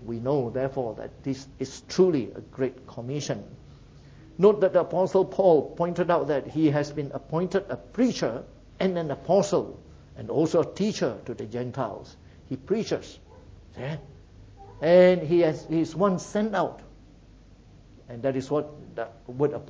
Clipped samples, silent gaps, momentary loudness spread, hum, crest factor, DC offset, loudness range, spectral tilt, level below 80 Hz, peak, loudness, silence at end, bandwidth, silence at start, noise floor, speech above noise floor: under 0.1%; none; 16 LU; none; 20 dB; under 0.1%; 8 LU; -6.5 dB/octave; -54 dBFS; -6 dBFS; -26 LUFS; 0 s; 8 kHz; 0 s; -52 dBFS; 26 dB